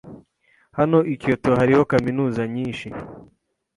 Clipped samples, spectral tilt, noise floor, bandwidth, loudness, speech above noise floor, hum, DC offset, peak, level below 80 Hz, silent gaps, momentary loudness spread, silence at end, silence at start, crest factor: under 0.1%; -8 dB/octave; -61 dBFS; 11.5 kHz; -20 LUFS; 42 dB; none; under 0.1%; -4 dBFS; -50 dBFS; none; 17 LU; 0.5 s; 0.05 s; 18 dB